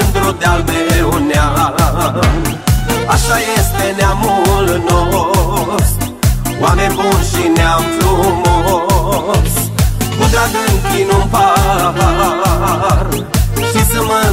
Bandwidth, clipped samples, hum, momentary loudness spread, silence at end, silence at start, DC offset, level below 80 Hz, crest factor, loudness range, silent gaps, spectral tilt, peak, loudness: 16.5 kHz; under 0.1%; none; 3 LU; 0 s; 0 s; under 0.1%; -18 dBFS; 12 dB; 1 LU; none; -5 dB/octave; 0 dBFS; -12 LUFS